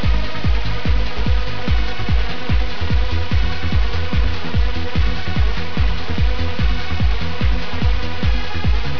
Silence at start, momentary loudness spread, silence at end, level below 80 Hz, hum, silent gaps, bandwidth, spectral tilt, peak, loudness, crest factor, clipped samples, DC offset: 0 s; 1 LU; 0 s; -20 dBFS; none; none; 5.4 kHz; -6.5 dB/octave; -6 dBFS; -21 LUFS; 10 dB; under 0.1%; 20%